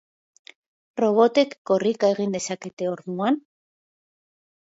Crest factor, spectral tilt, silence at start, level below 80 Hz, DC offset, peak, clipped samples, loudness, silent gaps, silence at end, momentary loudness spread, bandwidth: 18 dB; -5 dB/octave; 0.95 s; -74 dBFS; under 0.1%; -6 dBFS; under 0.1%; -23 LUFS; 1.58-1.65 s, 2.73-2.77 s; 1.3 s; 11 LU; 8 kHz